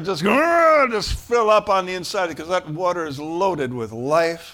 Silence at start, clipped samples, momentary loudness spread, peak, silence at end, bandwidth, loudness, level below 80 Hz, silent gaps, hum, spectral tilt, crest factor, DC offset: 0 s; under 0.1%; 10 LU; -4 dBFS; 0 s; 17.5 kHz; -20 LUFS; -42 dBFS; none; none; -4.5 dB/octave; 14 dB; under 0.1%